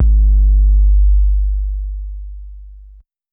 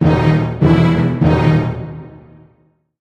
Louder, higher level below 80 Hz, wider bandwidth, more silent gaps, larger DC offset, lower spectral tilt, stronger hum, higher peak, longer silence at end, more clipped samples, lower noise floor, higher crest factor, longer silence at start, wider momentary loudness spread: about the same, -15 LUFS vs -14 LUFS; first, -12 dBFS vs -32 dBFS; second, 0.4 kHz vs 6.6 kHz; neither; neither; first, -14.5 dB/octave vs -9 dB/octave; neither; second, -4 dBFS vs 0 dBFS; second, 0.55 s vs 0.9 s; neither; second, -42 dBFS vs -56 dBFS; second, 8 dB vs 14 dB; about the same, 0 s vs 0 s; first, 20 LU vs 15 LU